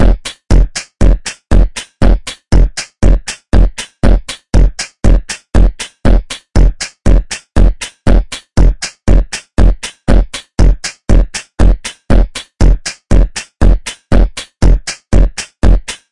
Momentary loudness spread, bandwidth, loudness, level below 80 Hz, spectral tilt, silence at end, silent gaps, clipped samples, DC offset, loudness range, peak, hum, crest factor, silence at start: 5 LU; 11 kHz; -15 LUFS; -12 dBFS; -5.5 dB/octave; 0 s; none; under 0.1%; 8%; 0 LU; 0 dBFS; none; 10 dB; 0 s